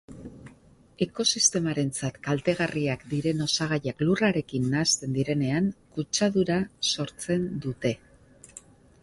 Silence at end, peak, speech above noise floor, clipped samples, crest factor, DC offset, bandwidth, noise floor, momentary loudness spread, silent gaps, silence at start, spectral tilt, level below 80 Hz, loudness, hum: 0.45 s; -8 dBFS; 29 dB; under 0.1%; 18 dB; under 0.1%; 11.5 kHz; -55 dBFS; 9 LU; none; 0.1 s; -4 dB/octave; -58 dBFS; -26 LUFS; none